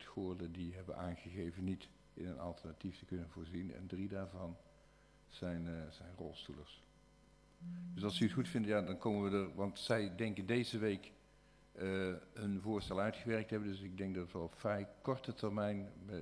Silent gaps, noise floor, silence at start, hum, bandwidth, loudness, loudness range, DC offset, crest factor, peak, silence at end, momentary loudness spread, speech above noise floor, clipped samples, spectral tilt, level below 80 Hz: none; -67 dBFS; 0 s; none; 11 kHz; -42 LUFS; 9 LU; under 0.1%; 22 dB; -20 dBFS; 0 s; 13 LU; 25 dB; under 0.1%; -6.5 dB/octave; -66 dBFS